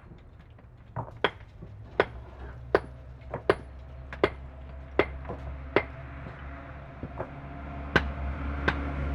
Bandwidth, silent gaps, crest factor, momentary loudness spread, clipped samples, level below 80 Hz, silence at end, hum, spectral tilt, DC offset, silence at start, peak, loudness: 10.5 kHz; none; 26 dB; 17 LU; under 0.1%; -40 dBFS; 0 s; none; -7 dB/octave; under 0.1%; 0 s; -6 dBFS; -32 LUFS